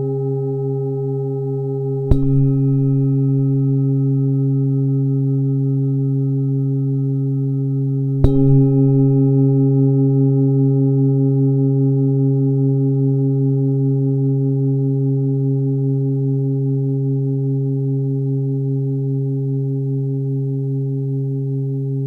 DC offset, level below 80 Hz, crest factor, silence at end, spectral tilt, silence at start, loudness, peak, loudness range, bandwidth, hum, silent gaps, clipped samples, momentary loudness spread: under 0.1%; -36 dBFS; 16 dB; 0 s; -13.5 dB/octave; 0 s; -18 LUFS; 0 dBFS; 5 LU; 1.4 kHz; none; none; under 0.1%; 7 LU